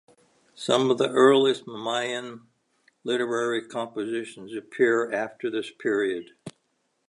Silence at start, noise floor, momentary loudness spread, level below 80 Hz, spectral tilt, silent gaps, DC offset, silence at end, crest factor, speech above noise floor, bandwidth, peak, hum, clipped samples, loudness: 0.6 s; -73 dBFS; 18 LU; -78 dBFS; -4.5 dB/octave; none; under 0.1%; 0.6 s; 20 dB; 49 dB; 11 kHz; -6 dBFS; none; under 0.1%; -25 LUFS